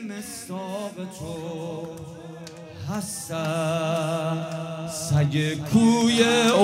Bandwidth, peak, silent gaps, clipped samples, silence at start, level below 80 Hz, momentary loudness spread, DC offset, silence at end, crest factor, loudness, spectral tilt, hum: 16 kHz; -4 dBFS; none; under 0.1%; 0 s; -56 dBFS; 19 LU; under 0.1%; 0 s; 20 dB; -25 LUFS; -5 dB/octave; none